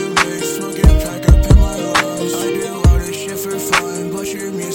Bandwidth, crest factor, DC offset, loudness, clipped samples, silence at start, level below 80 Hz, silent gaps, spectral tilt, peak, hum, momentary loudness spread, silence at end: 17 kHz; 14 dB; under 0.1%; -16 LUFS; under 0.1%; 0 s; -16 dBFS; none; -5 dB/octave; 0 dBFS; none; 9 LU; 0 s